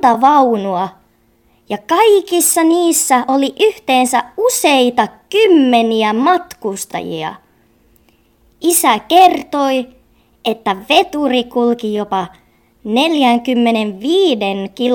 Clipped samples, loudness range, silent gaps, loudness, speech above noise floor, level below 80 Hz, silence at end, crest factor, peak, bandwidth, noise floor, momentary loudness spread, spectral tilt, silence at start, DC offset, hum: under 0.1%; 4 LU; none; -13 LUFS; 41 dB; -56 dBFS; 0 s; 14 dB; 0 dBFS; 19 kHz; -54 dBFS; 12 LU; -3 dB/octave; 0 s; under 0.1%; none